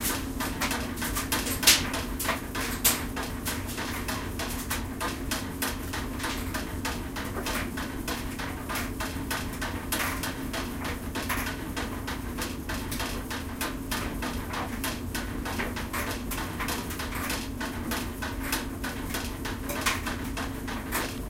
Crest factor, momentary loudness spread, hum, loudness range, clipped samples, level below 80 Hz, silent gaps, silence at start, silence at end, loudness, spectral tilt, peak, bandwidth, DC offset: 28 dB; 6 LU; none; 7 LU; under 0.1%; -40 dBFS; none; 0 s; 0 s; -30 LUFS; -3 dB/octave; -2 dBFS; 17 kHz; under 0.1%